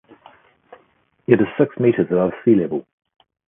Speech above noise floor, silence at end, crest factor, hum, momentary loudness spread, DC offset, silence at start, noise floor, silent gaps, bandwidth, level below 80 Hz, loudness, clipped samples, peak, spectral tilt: 43 dB; 0.65 s; 20 dB; none; 10 LU; under 0.1%; 1.3 s; -60 dBFS; none; 3.7 kHz; -58 dBFS; -18 LUFS; under 0.1%; 0 dBFS; -12.5 dB/octave